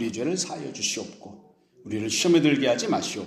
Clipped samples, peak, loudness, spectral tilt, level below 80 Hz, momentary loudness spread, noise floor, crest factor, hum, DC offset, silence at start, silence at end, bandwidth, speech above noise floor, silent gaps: under 0.1%; -8 dBFS; -24 LUFS; -3.5 dB/octave; -68 dBFS; 13 LU; -54 dBFS; 18 dB; none; under 0.1%; 0 s; 0 s; 15 kHz; 29 dB; none